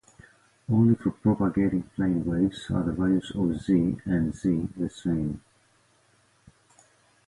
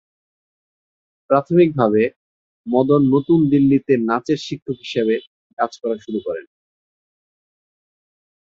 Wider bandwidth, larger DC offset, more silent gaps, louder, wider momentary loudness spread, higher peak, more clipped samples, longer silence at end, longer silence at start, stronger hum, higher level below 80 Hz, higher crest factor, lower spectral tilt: first, 11.5 kHz vs 7.4 kHz; neither; second, none vs 2.16-2.64 s, 4.62-4.66 s, 5.27-5.57 s; second, -26 LUFS vs -18 LUFS; second, 7 LU vs 11 LU; second, -10 dBFS vs -2 dBFS; neither; second, 1.9 s vs 2.05 s; second, 0.7 s vs 1.3 s; neither; first, -48 dBFS vs -58 dBFS; about the same, 16 dB vs 18 dB; about the same, -8.5 dB/octave vs -8 dB/octave